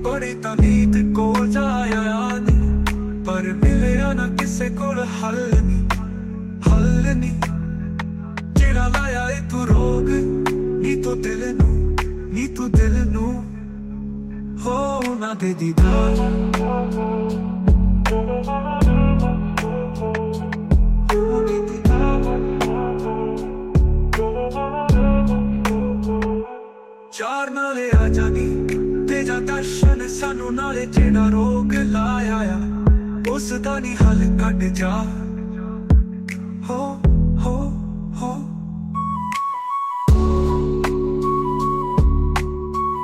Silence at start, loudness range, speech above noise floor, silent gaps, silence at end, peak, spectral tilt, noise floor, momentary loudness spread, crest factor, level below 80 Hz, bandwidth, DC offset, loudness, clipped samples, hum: 0 s; 3 LU; 22 dB; none; 0 s; -4 dBFS; -7 dB/octave; -40 dBFS; 10 LU; 14 dB; -22 dBFS; 13.5 kHz; under 0.1%; -20 LUFS; under 0.1%; none